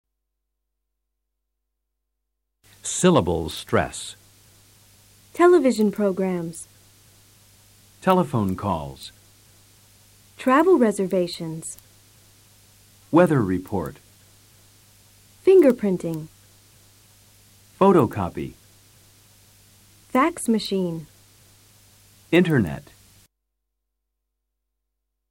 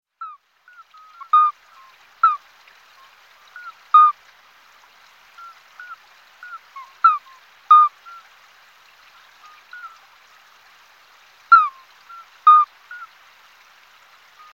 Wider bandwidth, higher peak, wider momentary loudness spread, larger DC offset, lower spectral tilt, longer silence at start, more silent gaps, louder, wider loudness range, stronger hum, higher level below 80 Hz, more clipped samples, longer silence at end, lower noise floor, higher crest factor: first, 16.5 kHz vs 7 kHz; second, -4 dBFS vs 0 dBFS; second, 20 LU vs 27 LU; neither; first, -6 dB/octave vs 1.5 dB/octave; first, 2.85 s vs 0.2 s; neither; second, -21 LUFS vs -15 LUFS; about the same, 6 LU vs 4 LU; neither; first, -54 dBFS vs -82 dBFS; neither; first, 2.5 s vs 1.55 s; first, -80 dBFS vs -51 dBFS; about the same, 20 dB vs 22 dB